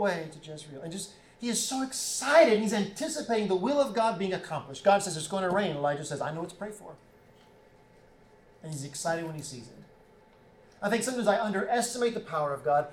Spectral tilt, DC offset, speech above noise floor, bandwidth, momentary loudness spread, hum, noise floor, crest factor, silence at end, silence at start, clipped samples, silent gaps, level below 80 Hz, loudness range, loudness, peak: -4 dB/octave; under 0.1%; 29 dB; 17.5 kHz; 16 LU; none; -58 dBFS; 20 dB; 0 s; 0 s; under 0.1%; none; -66 dBFS; 13 LU; -29 LUFS; -10 dBFS